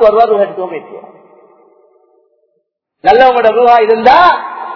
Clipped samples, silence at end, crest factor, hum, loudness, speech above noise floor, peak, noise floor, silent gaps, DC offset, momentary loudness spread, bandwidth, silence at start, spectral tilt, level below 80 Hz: 2%; 0 s; 10 dB; none; -8 LUFS; 57 dB; 0 dBFS; -65 dBFS; none; under 0.1%; 13 LU; 5.4 kHz; 0 s; -5.5 dB/octave; -46 dBFS